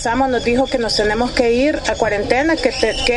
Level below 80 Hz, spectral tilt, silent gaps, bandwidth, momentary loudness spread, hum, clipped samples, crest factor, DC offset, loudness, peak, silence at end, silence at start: -32 dBFS; -4 dB/octave; none; 11.5 kHz; 2 LU; none; under 0.1%; 16 dB; under 0.1%; -16 LUFS; 0 dBFS; 0 s; 0 s